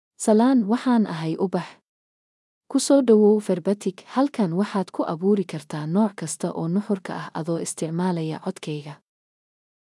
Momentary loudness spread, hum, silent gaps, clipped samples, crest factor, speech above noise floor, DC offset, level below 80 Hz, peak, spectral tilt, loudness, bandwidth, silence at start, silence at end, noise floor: 13 LU; none; 1.88-2.61 s; under 0.1%; 18 dB; over 68 dB; under 0.1%; -80 dBFS; -6 dBFS; -6 dB/octave; -23 LUFS; 12 kHz; 0.2 s; 0.85 s; under -90 dBFS